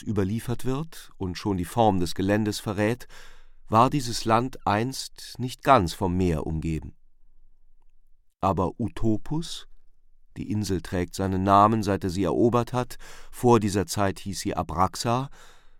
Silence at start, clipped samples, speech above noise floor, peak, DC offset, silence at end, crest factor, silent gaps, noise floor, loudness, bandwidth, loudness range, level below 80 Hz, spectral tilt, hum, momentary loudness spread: 0 s; under 0.1%; 28 dB; -4 dBFS; under 0.1%; 0.1 s; 22 dB; none; -53 dBFS; -25 LUFS; 17 kHz; 7 LU; -44 dBFS; -6 dB/octave; none; 14 LU